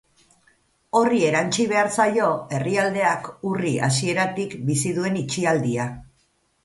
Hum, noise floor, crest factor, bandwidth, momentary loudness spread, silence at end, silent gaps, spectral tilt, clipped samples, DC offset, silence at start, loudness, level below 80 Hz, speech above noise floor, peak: none; -66 dBFS; 18 dB; 11.5 kHz; 7 LU; 0.6 s; none; -5 dB/octave; under 0.1%; under 0.1%; 0.95 s; -22 LUFS; -58 dBFS; 44 dB; -4 dBFS